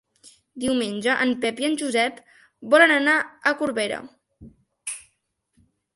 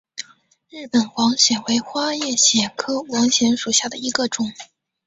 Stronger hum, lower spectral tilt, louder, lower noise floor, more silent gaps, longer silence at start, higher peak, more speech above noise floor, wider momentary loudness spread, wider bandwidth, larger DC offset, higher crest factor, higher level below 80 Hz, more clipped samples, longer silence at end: neither; first, -3 dB/octave vs -1.5 dB/octave; second, -21 LUFS vs -18 LUFS; first, -72 dBFS vs -42 dBFS; neither; first, 0.55 s vs 0.2 s; about the same, -2 dBFS vs -2 dBFS; first, 50 dB vs 22 dB; first, 18 LU vs 12 LU; first, 11.5 kHz vs 8.2 kHz; neither; about the same, 22 dB vs 20 dB; about the same, -64 dBFS vs -62 dBFS; neither; first, 0.95 s vs 0.45 s